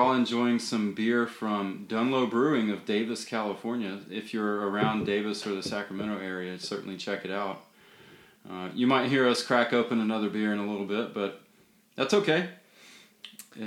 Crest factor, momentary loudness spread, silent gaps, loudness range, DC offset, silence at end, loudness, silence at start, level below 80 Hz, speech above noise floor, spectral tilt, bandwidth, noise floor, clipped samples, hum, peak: 22 dB; 11 LU; none; 5 LU; under 0.1%; 0 s; -29 LUFS; 0 s; -72 dBFS; 34 dB; -5 dB/octave; 14 kHz; -62 dBFS; under 0.1%; none; -8 dBFS